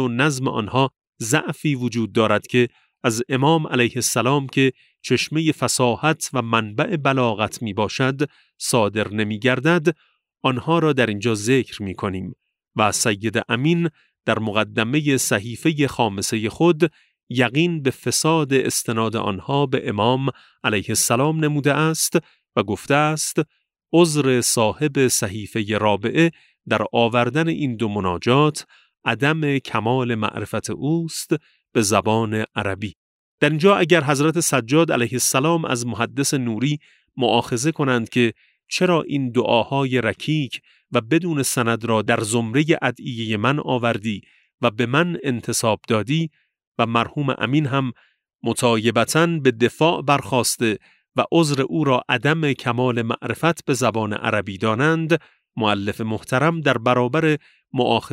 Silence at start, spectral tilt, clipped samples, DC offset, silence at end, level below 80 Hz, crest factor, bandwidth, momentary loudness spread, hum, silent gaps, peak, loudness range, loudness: 0 s; -4.5 dB/octave; under 0.1%; under 0.1%; 0.05 s; -60 dBFS; 18 dB; 16 kHz; 7 LU; none; 1.09-1.13 s, 17.23-17.27 s, 32.95-33.38 s, 44.54-44.58 s, 46.67-46.72 s, 48.35-48.39 s; -2 dBFS; 3 LU; -20 LUFS